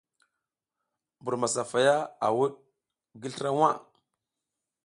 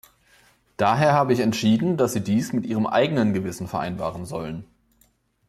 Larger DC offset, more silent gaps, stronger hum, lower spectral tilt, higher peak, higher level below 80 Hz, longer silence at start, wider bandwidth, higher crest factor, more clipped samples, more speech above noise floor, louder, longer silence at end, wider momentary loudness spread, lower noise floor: neither; neither; neither; second, -4 dB/octave vs -6 dB/octave; about the same, -8 dBFS vs -6 dBFS; second, -76 dBFS vs -58 dBFS; first, 1.25 s vs 0.8 s; second, 11.5 kHz vs 14 kHz; about the same, 22 dB vs 18 dB; neither; first, 60 dB vs 41 dB; second, -27 LUFS vs -22 LUFS; first, 1.05 s vs 0.85 s; about the same, 14 LU vs 12 LU; first, -87 dBFS vs -63 dBFS